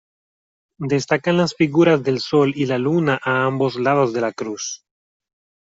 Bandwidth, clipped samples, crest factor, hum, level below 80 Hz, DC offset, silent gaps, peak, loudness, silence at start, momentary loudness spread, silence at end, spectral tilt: 7.8 kHz; under 0.1%; 16 dB; none; -60 dBFS; under 0.1%; none; -4 dBFS; -19 LUFS; 0.8 s; 11 LU; 0.85 s; -5.5 dB/octave